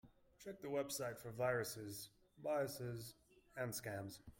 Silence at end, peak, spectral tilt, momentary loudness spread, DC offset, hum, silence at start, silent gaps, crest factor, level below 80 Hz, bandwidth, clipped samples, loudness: 0.05 s; -28 dBFS; -4.5 dB/octave; 15 LU; under 0.1%; none; 0.05 s; none; 18 dB; -74 dBFS; 16.5 kHz; under 0.1%; -45 LUFS